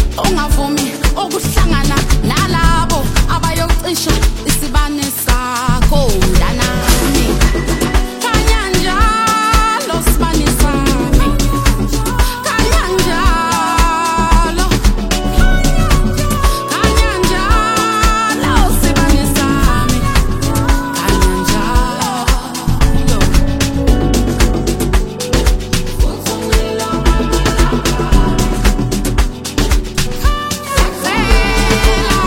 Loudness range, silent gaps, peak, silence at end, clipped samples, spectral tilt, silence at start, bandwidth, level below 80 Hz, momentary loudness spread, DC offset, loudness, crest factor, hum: 2 LU; none; 0 dBFS; 0 s; under 0.1%; -4.5 dB/octave; 0 s; 17 kHz; -14 dBFS; 4 LU; under 0.1%; -14 LUFS; 12 dB; none